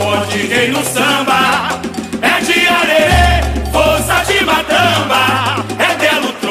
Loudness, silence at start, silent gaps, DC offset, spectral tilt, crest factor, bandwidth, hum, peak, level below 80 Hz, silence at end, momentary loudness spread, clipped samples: -12 LUFS; 0 s; none; under 0.1%; -3.5 dB/octave; 12 dB; 15.5 kHz; none; 0 dBFS; -24 dBFS; 0 s; 6 LU; under 0.1%